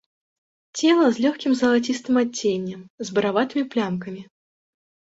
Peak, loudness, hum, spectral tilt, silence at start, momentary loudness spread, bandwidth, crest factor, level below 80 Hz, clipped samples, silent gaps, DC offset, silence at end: -6 dBFS; -22 LUFS; none; -4.5 dB/octave; 0.75 s; 16 LU; 8 kHz; 18 dB; -66 dBFS; under 0.1%; 2.90-2.98 s; under 0.1%; 0.9 s